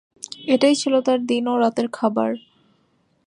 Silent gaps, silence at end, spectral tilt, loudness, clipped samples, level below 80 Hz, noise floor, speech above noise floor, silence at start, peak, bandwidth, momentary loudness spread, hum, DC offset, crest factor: none; 0.9 s; -4 dB/octave; -20 LUFS; under 0.1%; -74 dBFS; -64 dBFS; 45 dB; 0.4 s; -4 dBFS; 11 kHz; 13 LU; none; under 0.1%; 16 dB